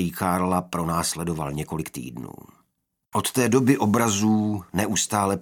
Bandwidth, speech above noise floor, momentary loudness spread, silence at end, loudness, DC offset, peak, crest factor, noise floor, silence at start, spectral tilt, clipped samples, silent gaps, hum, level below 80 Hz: 18 kHz; 52 dB; 12 LU; 0 s; -23 LUFS; under 0.1%; -4 dBFS; 20 dB; -75 dBFS; 0 s; -4.5 dB/octave; under 0.1%; none; none; -52 dBFS